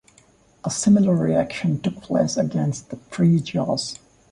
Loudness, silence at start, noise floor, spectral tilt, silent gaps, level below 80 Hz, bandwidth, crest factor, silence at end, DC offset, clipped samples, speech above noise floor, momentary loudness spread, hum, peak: -21 LUFS; 0.65 s; -56 dBFS; -6 dB/octave; none; -54 dBFS; 11.5 kHz; 16 dB; 0.35 s; under 0.1%; under 0.1%; 35 dB; 15 LU; none; -6 dBFS